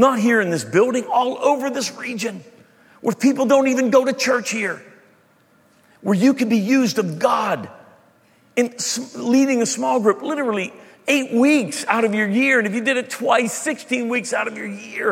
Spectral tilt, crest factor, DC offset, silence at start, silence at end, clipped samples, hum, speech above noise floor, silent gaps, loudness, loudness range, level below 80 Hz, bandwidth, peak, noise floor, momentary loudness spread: -4 dB/octave; 18 dB; under 0.1%; 0 s; 0 s; under 0.1%; none; 37 dB; none; -19 LUFS; 2 LU; -72 dBFS; 16 kHz; -2 dBFS; -56 dBFS; 10 LU